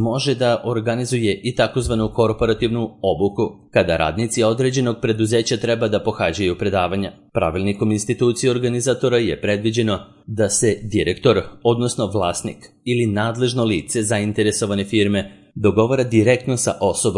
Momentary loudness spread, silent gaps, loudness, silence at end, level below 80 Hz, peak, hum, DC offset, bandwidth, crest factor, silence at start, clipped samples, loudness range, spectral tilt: 5 LU; none; -19 LUFS; 0 s; -44 dBFS; -2 dBFS; none; under 0.1%; 11.5 kHz; 16 dB; 0 s; under 0.1%; 1 LU; -5 dB/octave